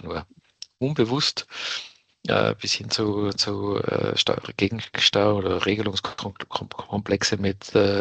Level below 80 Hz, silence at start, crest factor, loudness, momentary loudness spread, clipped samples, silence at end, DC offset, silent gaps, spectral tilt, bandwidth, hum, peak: -56 dBFS; 0.05 s; 20 dB; -24 LUFS; 11 LU; under 0.1%; 0 s; under 0.1%; none; -4 dB/octave; 9 kHz; none; -4 dBFS